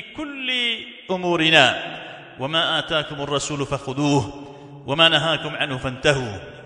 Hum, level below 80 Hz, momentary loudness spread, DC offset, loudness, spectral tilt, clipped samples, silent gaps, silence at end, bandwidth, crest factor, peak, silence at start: none; -50 dBFS; 17 LU; under 0.1%; -20 LUFS; -4 dB/octave; under 0.1%; none; 0 s; 11 kHz; 22 dB; 0 dBFS; 0 s